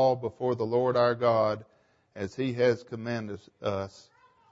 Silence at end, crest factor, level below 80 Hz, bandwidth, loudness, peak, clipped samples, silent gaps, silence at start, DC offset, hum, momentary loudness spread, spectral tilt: 0.5 s; 18 dB; -68 dBFS; 7.8 kHz; -29 LUFS; -12 dBFS; under 0.1%; none; 0 s; under 0.1%; none; 13 LU; -7 dB/octave